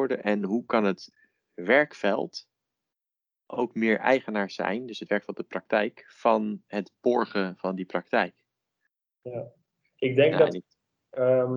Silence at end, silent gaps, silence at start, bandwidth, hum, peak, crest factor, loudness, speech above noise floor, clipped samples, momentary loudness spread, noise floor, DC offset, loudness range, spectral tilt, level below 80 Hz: 0 s; none; 0 s; 7.2 kHz; none; -6 dBFS; 22 dB; -27 LUFS; 63 dB; under 0.1%; 15 LU; -90 dBFS; under 0.1%; 3 LU; -6.5 dB/octave; -78 dBFS